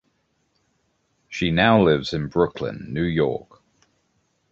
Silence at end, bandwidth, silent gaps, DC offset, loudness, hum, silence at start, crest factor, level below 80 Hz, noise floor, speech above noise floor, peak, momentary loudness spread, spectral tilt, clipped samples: 1.15 s; 7.8 kHz; none; under 0.1%; -21 LUFS; none; 1.3 s; 22 dB; -46 dBFS; -69 dBFS; 48 dB; -2 dBFS; 14 LU; -7 dB/octave; under 0.1%